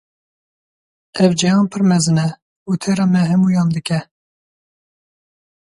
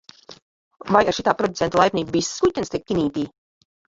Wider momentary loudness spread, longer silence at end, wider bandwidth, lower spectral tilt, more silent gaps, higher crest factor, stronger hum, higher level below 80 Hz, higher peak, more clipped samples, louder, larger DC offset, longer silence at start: about the same, 9 LU vs 10 LU; first, 1.75 s vs 0.6 s; first, 11.5 kHz vs 8 kHz; first, -6 dB/octave vs -4.5 dB/octave; about the same, 2.42-2.66 s vs 0.42-0.71 s; about the same, 18 dB vs 20 dB; neither; second, -58 dBFS vs -52 dBFS; about the same, 0 dBFS vs -2 dBFS; neither; first, -16 LUFS vs -21 LUFS; neither; first, 1.15 s vs 0.3 s